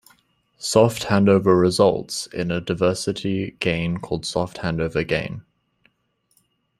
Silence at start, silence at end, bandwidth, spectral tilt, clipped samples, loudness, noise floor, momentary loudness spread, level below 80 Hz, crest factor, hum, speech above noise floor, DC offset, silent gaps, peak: 0.6 s; 1.4 s; 15 kHz; -5.5 dB/octave; under 0.1%; -21 LUFS; -68 dBFS; 10 LU; -50 dBFS; 20 dB; none; 48 dB; under 0.1%; none; -2 dBFS